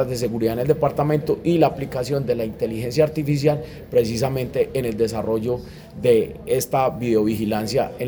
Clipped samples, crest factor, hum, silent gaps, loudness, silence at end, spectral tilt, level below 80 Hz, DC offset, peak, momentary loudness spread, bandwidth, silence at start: under 0.1%; 18 dB; none; none; -21 LUFS; 0 s; -6.5 dB/octave; -46 dBFS; under 0.1%; -2 dBFS; 6 LU; over 20 kHz; 0 s